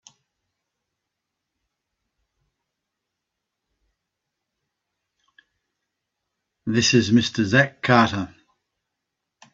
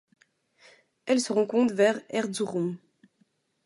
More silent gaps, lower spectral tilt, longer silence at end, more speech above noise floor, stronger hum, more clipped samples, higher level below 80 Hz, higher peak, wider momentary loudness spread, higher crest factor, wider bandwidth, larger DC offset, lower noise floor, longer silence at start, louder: neither; about the same, -4.5 dB/octave vs -4.5 dB/octave; first, 1.3 s vs 0.9 s; first, 64 dB vs 44 dB; neither; neither; first, -62 dBFS vs -78 dBFS; first, 0 dBFS vs -10 dBFS; first, 13 LU vs 10 LU; first, 26 dB vs 18 dB; second, 7.8 kHz vs 11.5 kHz; neither; first, -82 dBFS vs -70 dBFS; first, 6.65 s vs 1.05 s; first, -19 LUFS vs -26 LUFS